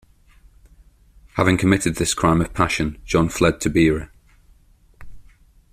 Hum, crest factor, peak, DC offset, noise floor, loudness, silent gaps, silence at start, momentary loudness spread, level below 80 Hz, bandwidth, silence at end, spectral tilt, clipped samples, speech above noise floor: none; 20 dB; -2 dBFS; under 0.1%; -53 dBFS; -19 LUFS; none; 1.35 s; 6 LU; -40 dBFS; 15.5 kHz; 0.5 s; -5 dB/octave; under 0.1%; 35 dB